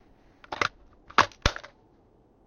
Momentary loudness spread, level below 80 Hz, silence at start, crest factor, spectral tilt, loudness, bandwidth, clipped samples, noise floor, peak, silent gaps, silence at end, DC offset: 15 LU; -44 dBFS; 0.5 s; 26 dB; -3 dB/octave; -27 LUFS; 13.5 kHz; under 0.1%; -61 dBFS; -4 dBFS; none; 0.8 s; under 0.1%